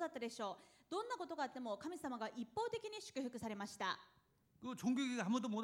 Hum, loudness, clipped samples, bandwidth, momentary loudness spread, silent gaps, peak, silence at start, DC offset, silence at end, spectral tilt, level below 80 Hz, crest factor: none; -44 LUFS; under 0.1%; 16 kHz; 8 LU; none; -28 dBFS; 0 s; under 0.1%; 0 s; -4.5 dB/octave; -82 dBFS; 18 dB